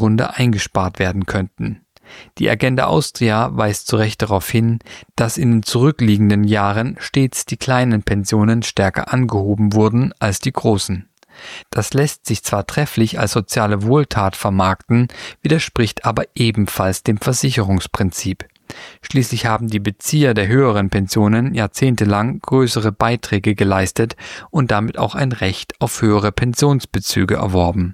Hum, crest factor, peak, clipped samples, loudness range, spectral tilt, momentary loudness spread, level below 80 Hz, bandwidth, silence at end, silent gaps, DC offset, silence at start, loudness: none; 16 dB; -2 dBFS; under 0.1%; 3 LU; -5.5 dB/octave; 7 LU; -40 dBFS; 16 kHz; 0 s; none; under 0.1%; 0 s; -17 LUFS